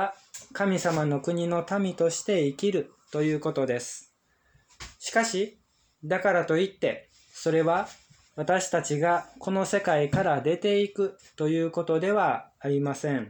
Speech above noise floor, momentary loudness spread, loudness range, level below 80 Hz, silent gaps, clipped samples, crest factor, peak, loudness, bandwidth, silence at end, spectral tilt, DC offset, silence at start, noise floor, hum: 39 dB; 10 LU; 3 LU; -64 dBFS; none; under 0.1%; 16 dB; -12 dBFS; -27 LUFS; over 20 kHz; 0 s; -5 dB/octave; under 0.1%; 0 s; -66 dBFS; none